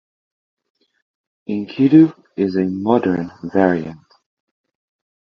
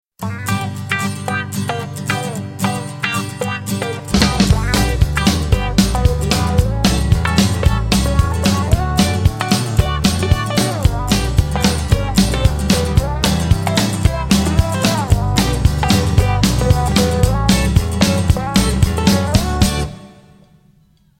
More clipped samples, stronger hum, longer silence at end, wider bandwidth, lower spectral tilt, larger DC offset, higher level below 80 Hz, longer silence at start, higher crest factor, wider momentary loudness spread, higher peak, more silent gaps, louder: neither; neither; first, 1.25 s vs 1.1 s; second, 6 kHz vs 17 kHz; first, -9.5 dB/octave vs -5 dB/octave; neither; second, -54 dBFS vs -22 dBFS; first, 1.5 s vs 0.2 s; about the same, 18 dB vs 16 dB; first, 14 LU vs 7 LU; about the same, 0 dBFS vs 0 dBFS; neither; about the same, -17 LUFS vs -16 LUFS